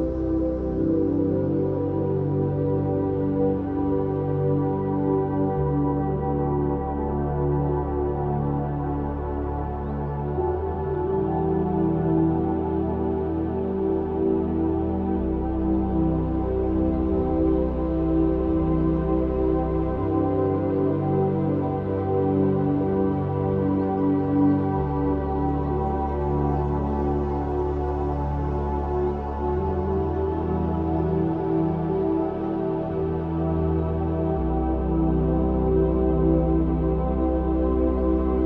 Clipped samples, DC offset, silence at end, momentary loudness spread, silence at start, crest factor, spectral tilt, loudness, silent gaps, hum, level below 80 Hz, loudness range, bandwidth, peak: under 0.1%; under 0.1%; 0 s; 4 LU; 0 s; 14 dB; -12 dB/octave; -24 LUFS; none; none; -32 dBFS; 3 LU; 4.3 kHz; -10 dBFS